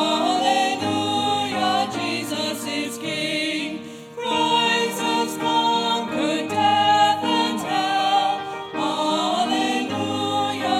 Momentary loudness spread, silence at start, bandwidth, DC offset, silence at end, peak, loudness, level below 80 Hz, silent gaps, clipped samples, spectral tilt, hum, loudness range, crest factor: 8 LU; 0 s; 16.5 kHz; under 0.1%; 0 s; -6 dBFS; -21 LUFS; -70 dBFS; none; under 0.1%; -3 dB/octave; none; 4 LU; 16 dB